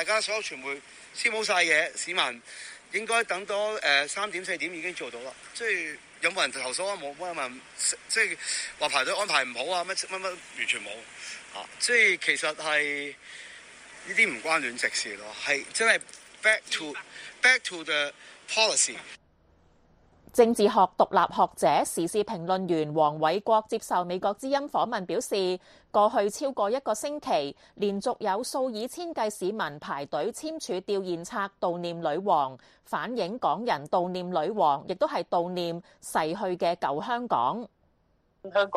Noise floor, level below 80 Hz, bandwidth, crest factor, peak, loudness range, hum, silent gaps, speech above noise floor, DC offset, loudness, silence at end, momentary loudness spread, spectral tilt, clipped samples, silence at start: -68 dBFS; -70 dBFS; 15 kHz; 22 dB; -8 dBFS; 5 LU; none; none; 40 dB; under 0.1%; -27 LUFS; 0 s; 13 LU; -2.5 dB/octave; under 0.1%; 0 s